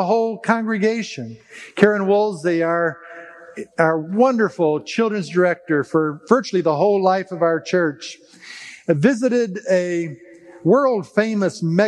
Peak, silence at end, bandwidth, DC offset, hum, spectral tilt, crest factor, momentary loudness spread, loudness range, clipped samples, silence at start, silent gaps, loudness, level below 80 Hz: 0 dBFS; 0 s; 11 kHz; under 0.1%; none; -6.5 dB/octave; 20 dB; 18 LU; 2 LU; under 0.1%; 0 s; none; -19 LUFS; -72 dBFS